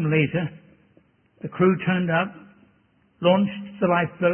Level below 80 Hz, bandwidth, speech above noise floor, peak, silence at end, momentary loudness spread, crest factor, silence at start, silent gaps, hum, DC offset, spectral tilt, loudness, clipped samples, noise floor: -62 dBFS; 3.3 kHz; 40 dB; -6 dBFS; 0 s; 11 LU; 18 dB; 0 s; none; none; under 0.1%; -11.5 dB/octave; -23 LUFS; under 0.1%; -62 dBFS